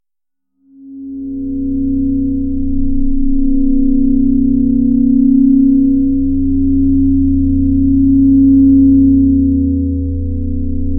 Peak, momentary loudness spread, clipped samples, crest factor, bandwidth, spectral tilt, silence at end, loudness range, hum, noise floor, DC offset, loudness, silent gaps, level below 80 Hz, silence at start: 0 dBFS; 11 LU; under 0.1%; 10 dB; 0.8 kHz; -16.5 dB/octave; 0 s; 7 LU; none; -84 dBFS; under 0.1%; -12 LUFS; none; -20 dBFS; 0.8 s